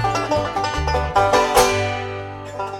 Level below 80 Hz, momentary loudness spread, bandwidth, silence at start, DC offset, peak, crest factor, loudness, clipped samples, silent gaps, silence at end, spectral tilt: -32 dBFS; 14 LU; 17 kHz; 0 s; under 0.1%; -4 dBFS; 14 dB; -19 LUFS; under 0.1%; none; 0 s; -4 dB/octave